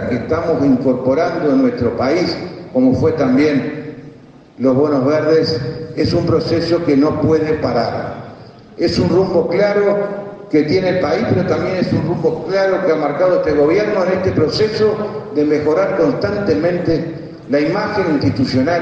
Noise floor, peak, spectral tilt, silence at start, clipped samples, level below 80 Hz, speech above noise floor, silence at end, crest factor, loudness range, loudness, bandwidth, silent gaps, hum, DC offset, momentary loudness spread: -40 dBFS; -2 dBFS; -7.5 dB/octave; 0 s; under 0.1%; -46 dBFS; 25 dB; 0 s; 14 dB; 2 LU; -16 LUFS; 8 kHz; none; none; under 0.1%; 7 LU